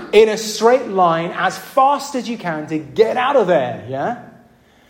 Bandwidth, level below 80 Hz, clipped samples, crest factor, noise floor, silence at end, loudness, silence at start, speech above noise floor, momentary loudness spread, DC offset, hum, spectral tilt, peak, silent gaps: 16.5 kHz; -58 dBFS; under 0.1%; 16 dB; -50 dBFS; 0.6 s; -17 LUFS; 0 s; 34 dB; 10 LU; under 0.1%; none; -4.5 dB/octave; -2 dBFS; none